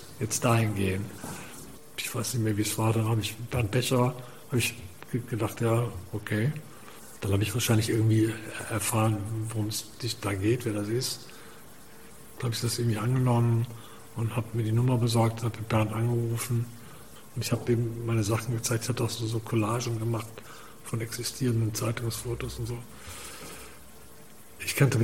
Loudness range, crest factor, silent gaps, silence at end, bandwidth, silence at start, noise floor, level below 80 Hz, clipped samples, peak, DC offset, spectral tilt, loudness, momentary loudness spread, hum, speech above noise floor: 4 LU; 22 dB; none; 0 s; 16.5 kHz; 0 s; -51 dBFS; -56 dBFS; under 0.1%; -6 dBFS; 0.4%; -5.5 dB/octave; -29 LUFS; 18 LU; none; 24 dB